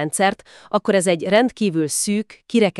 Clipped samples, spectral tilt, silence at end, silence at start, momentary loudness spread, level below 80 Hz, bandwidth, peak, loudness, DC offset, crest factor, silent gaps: under 0.1%; -4 dB/octave; 0 s; 0 s; 7 LU; -60 dBFS; 13.5 kHz; -2 dBFS; -19 LUFS; under 0.1%; 16 dB; none